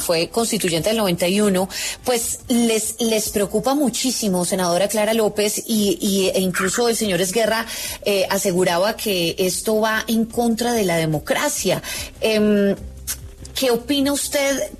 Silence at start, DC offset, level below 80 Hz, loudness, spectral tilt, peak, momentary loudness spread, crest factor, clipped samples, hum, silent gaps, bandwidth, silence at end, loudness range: 0 s; under 0.1%; -44 dBFS; -19 LUFS; -3.5 dB/octave; -6 dBFS; 4 LU; 12 dB; under 0.1%; none; none; 13.5 kHz; 0 s; 1 LU